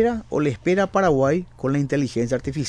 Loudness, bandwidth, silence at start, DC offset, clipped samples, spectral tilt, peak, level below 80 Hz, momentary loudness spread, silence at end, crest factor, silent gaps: -22 LUFS; 10.5 kHz; 0 s; 0.2%; under 0.1%; -6.5 dB/octave; -8 dBFS; -44 dBFS; 6 LU; 0 s; 14 dB; none